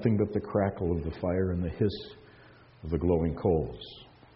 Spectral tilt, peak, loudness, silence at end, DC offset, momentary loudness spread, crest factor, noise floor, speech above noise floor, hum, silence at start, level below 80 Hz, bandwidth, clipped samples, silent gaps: -7.5 dB/octave; -12 dBFS; -30 LUFS; 0.3 s; under 0.1%; 17 LU; 18 dB; -55 dBFS; 26 dB; none; 0 s; -46 dBFS; 5.8 kHz; under 0.1%; none